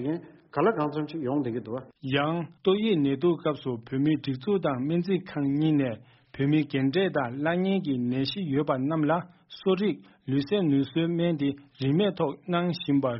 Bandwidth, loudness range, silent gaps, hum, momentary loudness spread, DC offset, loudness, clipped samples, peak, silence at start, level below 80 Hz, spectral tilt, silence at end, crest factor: 5.8 kHz; 1 LU; none; none; 7 LU; under 0.1%; -27 LUFS; under 0.1%; -10 dBFS; 0 s; -66 dBFS; -6 dB/octave; 0 s; 16 dB